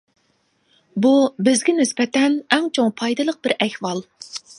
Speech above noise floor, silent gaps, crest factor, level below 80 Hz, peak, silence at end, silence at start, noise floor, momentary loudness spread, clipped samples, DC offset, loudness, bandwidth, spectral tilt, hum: 46 dB; none; 20 dB; -70 dBFS; 0 dBFS; 0.05 s; 0.95 s; -65 dBFS; 12 LU; under 0.1%; under 0.1%; -19 LUFS; 11.5 kHz; -3.5 dB/octave; none